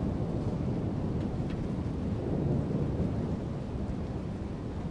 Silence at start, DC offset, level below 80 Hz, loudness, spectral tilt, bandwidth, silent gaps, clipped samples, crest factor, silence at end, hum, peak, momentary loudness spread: 0 s; under 0.1%; -42 dBFS; -33 LUFS; -9 dB/octave; 10.5 kHz; none; under 0.1%; 14 dB; 0 s; none; -18 dBFS; 6 LU